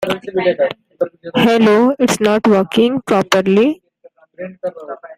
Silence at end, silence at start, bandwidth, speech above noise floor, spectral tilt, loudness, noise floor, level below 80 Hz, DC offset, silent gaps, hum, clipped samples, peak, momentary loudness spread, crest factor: 0.05 s; 0 s; 16 kHz; 34 dB; -5 dB/octave; -14 LUFS; -48 dBFS; -54 dBFS; under 0.1%; none; none; under 0.1%; 0 dBFS; 15 LU; 14 dB